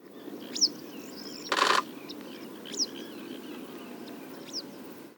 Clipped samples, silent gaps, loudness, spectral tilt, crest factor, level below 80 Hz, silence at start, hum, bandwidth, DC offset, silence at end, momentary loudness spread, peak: under 0.1%; none; -31 LUFS; -1 dB/octave; 26 dB; -84 dBFS; 0 s; none; 19.5 kHz; under 0.1%; 0 s; 17 LU; -8 dBFS